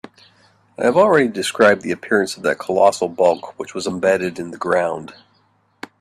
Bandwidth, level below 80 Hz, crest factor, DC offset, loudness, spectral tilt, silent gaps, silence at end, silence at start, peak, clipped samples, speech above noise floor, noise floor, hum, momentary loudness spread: 14 kHz; -62 dBFS; 18 dB; under 0.1%; -18 LUFS; -4.5 dB/octave; none; 0.9 s; 0.8 s; 0 dBFS; under 0.1%; 43 dB; -60 dBFS; none; 12 LU